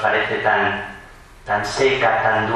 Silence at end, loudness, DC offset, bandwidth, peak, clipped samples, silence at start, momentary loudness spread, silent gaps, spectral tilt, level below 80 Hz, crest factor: 0 s; -18 LUFS; under 0.1%; 12 kHz; -4 dBFS; under 0.1%; 0 s; 12 LU; none; -4 dB/octave; -46 dBFS; 16 dB